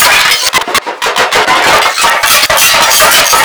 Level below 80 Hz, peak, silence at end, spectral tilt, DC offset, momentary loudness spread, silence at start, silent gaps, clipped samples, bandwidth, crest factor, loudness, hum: -38 dBFS; 0 dBFS; 0 s; 0.5 dB/octave; under 0.1%; 6 LU; 0 s; none; 4%; over 20 kHz; 8 dB; -6 LUFS; none